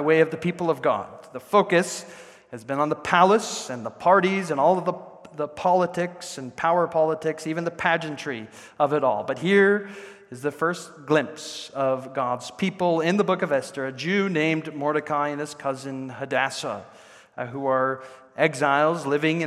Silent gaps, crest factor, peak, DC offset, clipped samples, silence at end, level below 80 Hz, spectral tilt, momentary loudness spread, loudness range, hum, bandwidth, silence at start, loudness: none; 22 dB; -2 dBFS; under 0.1%; under 0.1%; 0 s; -70 dBFS; -5 dB/octave; 15 LU; 4 LU; none; 13.5 kHz; 0 s; -24 LUFS